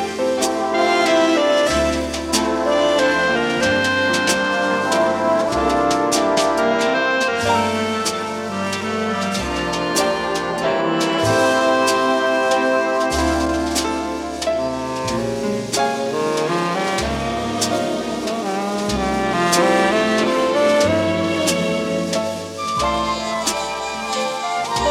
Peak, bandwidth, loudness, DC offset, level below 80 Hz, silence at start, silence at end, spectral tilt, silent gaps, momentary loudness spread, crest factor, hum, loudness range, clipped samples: -4 dBFS; 17 kHz; -18 LUFS; under 0.1%; -40 dBFS; 0 s; 0 s; -3.5 dB/octave; none; 7 LU; 16 dB; none; 4 LU; under 0.1%